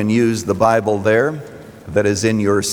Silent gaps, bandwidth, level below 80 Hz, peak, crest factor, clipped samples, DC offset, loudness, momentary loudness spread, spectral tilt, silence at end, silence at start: none; over 20 kHz; -52 dBFS; -2 dBFS; 14 dB; under 0.1%; under 0.1%; -16 LUFS; 13 LU; -5 dB/octave; 0 s; 0 s